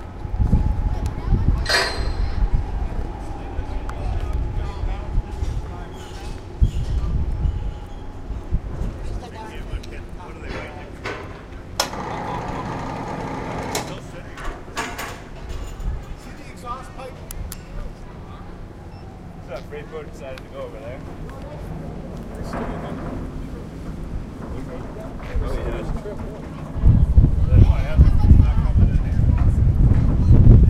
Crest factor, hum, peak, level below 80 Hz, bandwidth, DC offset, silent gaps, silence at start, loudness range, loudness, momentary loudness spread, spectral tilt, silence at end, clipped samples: 20 dB; none; 0 dBFS; -24 dBFS; 15 kHz; under 0.1%; none; 0 s; 17 LU; -23 LUFS; 19 LU; -6.5 dB/octave; 0 s; under 0.1%